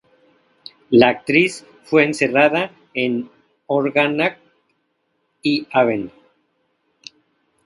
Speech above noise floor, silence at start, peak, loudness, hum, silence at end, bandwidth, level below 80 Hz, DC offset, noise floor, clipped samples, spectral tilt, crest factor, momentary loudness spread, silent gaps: 52 dB; 0.9 s; 0 dBFS; -18 LUFS; none; 1.6 s; 11.5 kHz; -64 dBFS; under 0.1%; -69 dBFS; under 0.1%; -5.5 dB/octave; 20 dB; 12 LU; none